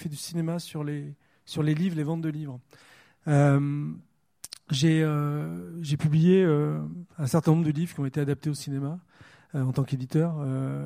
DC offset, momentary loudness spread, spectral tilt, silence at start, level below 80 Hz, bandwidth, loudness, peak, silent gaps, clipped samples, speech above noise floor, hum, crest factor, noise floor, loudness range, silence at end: under 0.1%; 16 LU; -7 dB/octave; 0 s; -64 dBFS; 15 kHz; -27 LUFS; -8 dBFS; none; under 0.1%; 21 dB; none; 18 dB; -47 dBFS; 4 LU; 0 s